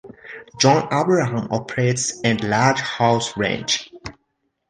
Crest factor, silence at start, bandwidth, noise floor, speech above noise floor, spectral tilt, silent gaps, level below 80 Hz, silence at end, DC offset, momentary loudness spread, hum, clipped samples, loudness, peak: 18 dB; 0.05 s; 10 kHz; -72 dBFS; 52 dB; -4 dB/octave; none; -54 dBFS; 0.6 s; under 0.1%; 21 LU; none; under 0.1%; -19 LUFS; -2 dBFS